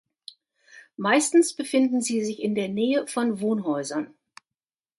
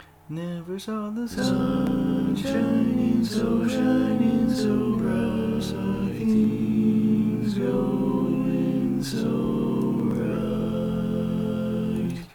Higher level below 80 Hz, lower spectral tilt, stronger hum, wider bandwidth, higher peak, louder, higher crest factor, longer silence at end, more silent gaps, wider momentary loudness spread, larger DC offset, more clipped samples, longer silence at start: second, -74 dBFS vs -46 dBFS; second, -4 dB/octave vs -7.5 dB/octave; neither; second, 12 kHz vs 17.5 kHz; first, -6 dBFS vs -10 dBFS; about the same, -24 LUFS vs -24 LUFS; first, 18 dB vs 12 dB; first, 0.9 s vs 0.05 s; neither; first, 10 LU vs 6 LU; neither; neither; first, 0.75 s vs 0 s